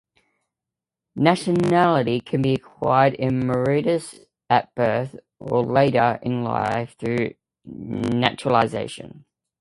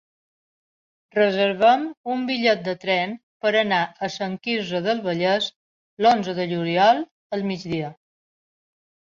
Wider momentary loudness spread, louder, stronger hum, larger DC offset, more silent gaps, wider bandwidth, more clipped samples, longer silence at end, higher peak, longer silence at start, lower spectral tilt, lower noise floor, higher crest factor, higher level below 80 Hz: first, 15 LU vs 10 LU; about the same, -21 LUFS vs -22 LUFS; neither; neither; second, none vs 1.97-2.04 s, 3.23-3.40 s, 5.56-5.97 s, 7.11-7.30 s; first, 11.5 kHz vs 7.4 kHz; neither; second, 0.45 s vs 1.15 s; about the same, -2 dBFS vs -4 dBFS; about the same, 1.15 s vs 1.15 s; about the same, -6.5 dB/octave vs -5.5 dB/octave; about the same, -87 dBFS vs under -90 dBFS; about the same, 20 dB vs 18 dB; first, -56 dBFS vs -68 dBFS